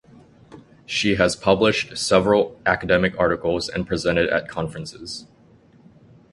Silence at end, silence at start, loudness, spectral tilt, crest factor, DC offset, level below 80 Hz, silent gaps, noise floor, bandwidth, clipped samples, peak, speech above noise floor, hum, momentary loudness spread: 1.1 s; 0.5 s; -20 LUFS; -4.5 dB/octave; 22 dB; under 0.1%; -46 dBFS; none; -52 dBFS; 11.5 kHz; under 0.1%; 0 dBFS; 32 dB; none; 13 LU